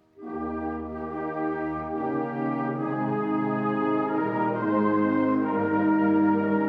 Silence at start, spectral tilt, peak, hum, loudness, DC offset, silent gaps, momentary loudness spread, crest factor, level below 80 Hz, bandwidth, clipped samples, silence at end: 0.2 s; -10 dB/octave; -12 dBFS; none; -26 LUFS; under 0.1%; none; 10 LU; 14 dB; -56 dBFS; 4.4 kHz; under 0.1%; 0 s